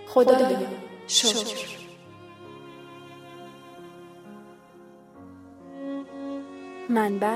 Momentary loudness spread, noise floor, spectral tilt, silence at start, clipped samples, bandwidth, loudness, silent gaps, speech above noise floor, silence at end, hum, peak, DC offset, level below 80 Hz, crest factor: 26 LU; -50 dBFS; -2.5 dB/octave; 0 s; under 0.1%; 16 kHz; -24 LUFS; none; 28 dB; 0 s; none; -4 dBFS; under 0.1%; -74 dBFS; 24 dB